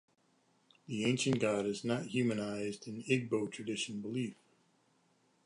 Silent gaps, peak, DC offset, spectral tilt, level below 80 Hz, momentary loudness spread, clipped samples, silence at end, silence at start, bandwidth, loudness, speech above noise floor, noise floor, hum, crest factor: none; -18 dBFS; under 0.1%; -5 dB/octave; -76 dBFS; 9 LU; under 0.1%; 1.1 s; 0.9 s; 11 kHz; -36 LUFS; 38 dB; -73 dBFS; none; 20 dB